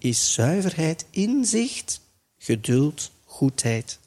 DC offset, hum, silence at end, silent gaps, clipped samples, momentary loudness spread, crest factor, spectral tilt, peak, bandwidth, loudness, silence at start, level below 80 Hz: under 0.1%; none; 0.1 s; none; under 0.1%; 11 LU; 16 dB; -4.5 dB/octave; -8 dBFS; 15 kHz; -23 LUFS; 0.05 s; -60 dBFS